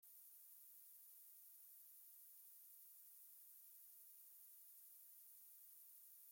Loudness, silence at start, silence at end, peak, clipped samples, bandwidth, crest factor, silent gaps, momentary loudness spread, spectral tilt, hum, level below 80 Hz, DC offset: -61 LUFS; 0 s; 0 s; -52 dBFS; under 0.1%; 17 kHz; 14 dB; none; 0 LU; 3 dB/octave; none; under -90 dBFS; under 0.1%